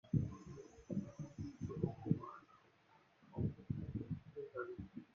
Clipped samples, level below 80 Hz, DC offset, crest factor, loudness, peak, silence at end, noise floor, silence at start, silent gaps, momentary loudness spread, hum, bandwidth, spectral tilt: under 0.1%; -64 dBFS; under 0.1%; 24 dB; -46 LUFS; -22 dBFS; 0.1 s; -71 dBFS; 0.05 s; none; 14 LU; none; 7.2 kHz; -9.5 dB/octave